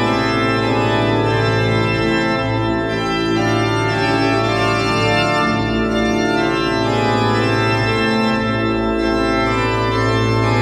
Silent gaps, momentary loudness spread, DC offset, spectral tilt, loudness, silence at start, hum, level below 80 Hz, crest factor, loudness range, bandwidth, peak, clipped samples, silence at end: none; 2 LU; under 0.1%; -6 dB/octave; -16 LUFS; 0 s; none; -34 dBFS; 12 dB; 1 LU; 11.5 kHz; -4 dBFS; under 0.1%; 0 s